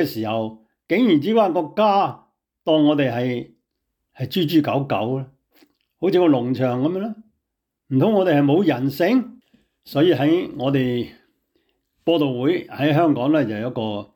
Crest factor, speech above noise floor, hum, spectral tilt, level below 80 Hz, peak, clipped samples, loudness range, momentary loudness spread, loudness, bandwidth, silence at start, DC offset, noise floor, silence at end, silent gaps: 14 dB; 60 dB; none; -8 dB/octave; -64 dBFS; -6 dBFS; under 0.1%; 3 LU; 11 LU; -20 LUFS; 19.5 kHz; 0 s; under 0.1%; -79 dBFS; 0.1 s; none